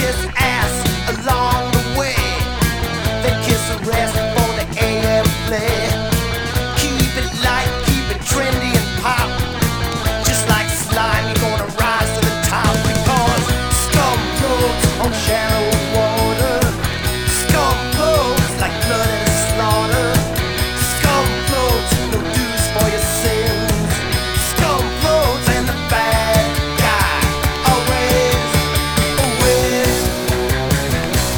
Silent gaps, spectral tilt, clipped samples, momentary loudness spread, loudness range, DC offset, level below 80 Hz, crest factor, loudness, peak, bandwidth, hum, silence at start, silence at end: none; -4 dB/octave; under 0.1%; 4 LU; 2 LU; under 0.1%; -26 dBFS; 16 dB; -16 LUFS; 0 dBFS; over 20 kHz; none; 0 s; 0 s